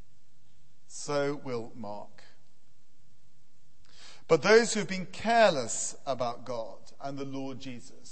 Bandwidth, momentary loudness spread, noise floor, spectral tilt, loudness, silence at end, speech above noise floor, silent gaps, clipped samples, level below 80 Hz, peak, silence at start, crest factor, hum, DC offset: 8.8 kHz; 21 LU; -69 dBFS; -3.5 dB/octave; -29 LUFS; 0 s; 40 dB; none; under 0.1%; -68 dBFS; -6 dBFS; 0.9 s; 24 dB; none; 1%